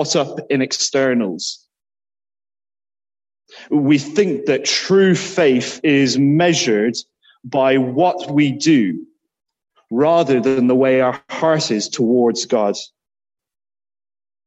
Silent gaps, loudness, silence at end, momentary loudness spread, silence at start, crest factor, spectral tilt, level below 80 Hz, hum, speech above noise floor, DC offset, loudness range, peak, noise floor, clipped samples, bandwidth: none; -16 LUFS; 1.6 s; 8 LU; 0 s; 14 dB; -4.5 dB/octave; -64 dBFS; none; over 74 dB; under 0.1%; 6 LU; -2 dBFS; under -90 dBFS; under 0.1%; 8.4 kHz